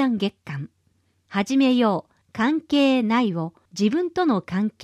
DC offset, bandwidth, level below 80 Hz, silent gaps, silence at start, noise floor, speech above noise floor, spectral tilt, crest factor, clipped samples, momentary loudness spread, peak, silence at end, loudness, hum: under 0.1%; 11.5 kHz; -64 dBFS; none; 0 s; -66 dBFS; 44 dB; -6 dB/octave; 14 dB; under 0.1%; 15 LU; -8 dBFS; 0 s; -22 LUFS; none